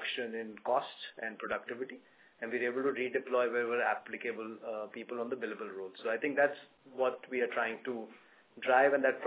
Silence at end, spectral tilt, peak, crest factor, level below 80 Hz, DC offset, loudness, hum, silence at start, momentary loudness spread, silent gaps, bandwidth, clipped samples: 0 s; -1.5 dB/octave; -14 dBFS; 22 dB; -86 dBFS; under 0.1%; -34 LUFS; none; 0 s; 13 LU; none; 4 kHz; under 0.1%